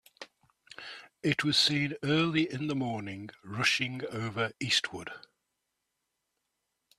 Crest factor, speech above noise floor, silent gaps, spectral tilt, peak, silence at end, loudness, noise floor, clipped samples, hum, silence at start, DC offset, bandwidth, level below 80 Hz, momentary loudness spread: 24 dB; 52 dB; none; -4 dB/octave; -10 dBFS; 1.8 s; -29 LUFS; -83 dBFS; under 0.1%; none; 0.2 s; under 0.1%; 14 kHz; -70 dBFS; 20 LU